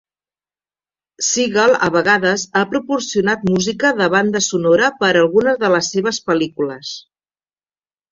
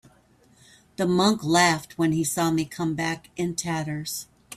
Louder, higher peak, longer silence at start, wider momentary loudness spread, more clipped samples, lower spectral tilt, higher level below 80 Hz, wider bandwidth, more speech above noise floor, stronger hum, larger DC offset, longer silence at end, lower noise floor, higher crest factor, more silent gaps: first, -16 LUFS vs -24 LUFS; first, -2 dBFS vs -6 dBFS; first, 1.2 s vs 1 s; second, 8 LU vs 11 LU; neither; about the same, -3.5 dB/octave vs -4.5 dB/octave; about the same, -56 dBFS vs -60 dBFS; second, 7.6 kHz vs 16 kHz; first, over 74 dB vs 34 dB; neither; neither; first, 1.1 s vs 0 s; first, under -90 dBFS vs -59 dBFS; about the same, 16 dB vs 20 dB; neither